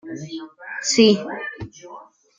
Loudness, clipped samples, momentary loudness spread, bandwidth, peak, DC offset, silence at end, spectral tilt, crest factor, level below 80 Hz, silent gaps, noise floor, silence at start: -18 LUFS; under 0.1%; 22 LU; 9.6 kHz; -2 dBFS; under 0.1%; 0.35 s; -3.5 dB/octave; 20 dB; -58 dBFS; none; -43 dBFS; 0.05 s